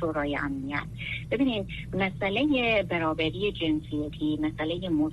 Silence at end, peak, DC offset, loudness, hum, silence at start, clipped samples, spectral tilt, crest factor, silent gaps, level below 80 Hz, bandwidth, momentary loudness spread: 0 s; -12 dBFS; under 0.1%; -28 LUFS; none; 0 s; under 0.1%; -7 dB/octave; 16 dB; none; -46 dBFS; 11 kHz; 8 LU